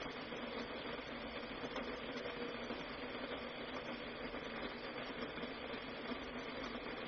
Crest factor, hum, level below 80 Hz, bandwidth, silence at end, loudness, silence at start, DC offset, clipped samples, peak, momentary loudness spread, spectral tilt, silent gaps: 14 dB; none; -64 dBFS; 6.6 kHz; 0 s; -45 LUFS; 0 s; under 0.1%; under 0.1%; -32 dBFS; 1 LU; -2 dB/octave; none